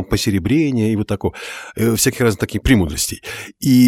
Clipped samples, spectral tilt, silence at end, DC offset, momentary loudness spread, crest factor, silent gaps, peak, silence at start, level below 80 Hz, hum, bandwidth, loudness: under 0.1%; -5 dB/octave; 0 s; under 0.1%; 11 LU; 16 dB; none; 0 dBFS; 0 s; -34 dBFS; none; 17.5 kHz; -17 LUFS